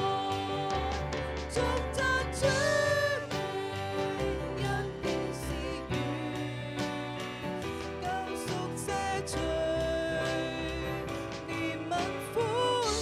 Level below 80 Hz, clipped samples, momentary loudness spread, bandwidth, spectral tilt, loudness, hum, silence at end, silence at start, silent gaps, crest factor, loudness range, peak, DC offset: -46 dBFS; under 0.1%; 8 LU; 16 kHz; -4.5 dB/octave; -32 LUFS; none; 0 s; 0 s; none; 18 dB; 5 LU; -14 dBFS; under 0.1%